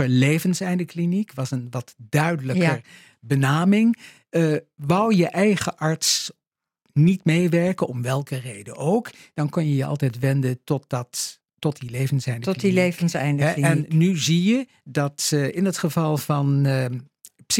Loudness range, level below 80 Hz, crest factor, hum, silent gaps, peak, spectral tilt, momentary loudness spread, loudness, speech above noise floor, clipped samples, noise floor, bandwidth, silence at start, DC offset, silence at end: 4 LU; -64 dBFS; 16 dB; none; none; -6 dBFS; -5.5 dB/octave; 10 LU; -22 LUFS; 53 dB; under 0.1%; -74 dBFS; 16.5 kHz; 0 s; under 0.1%; 0 s